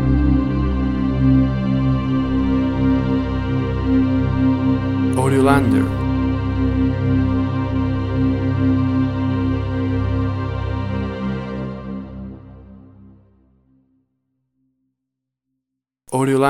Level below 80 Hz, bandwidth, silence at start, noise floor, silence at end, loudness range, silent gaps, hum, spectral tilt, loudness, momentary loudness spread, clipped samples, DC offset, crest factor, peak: -30 dBFS; 12 kHz; 0 s; -81 dBFS; 0 s; 12 LU; none; none; -8 dB/octave; -19 LUFS; 9 LU; under 0.1%; under 0.1%; 18 dB; 0 dBFS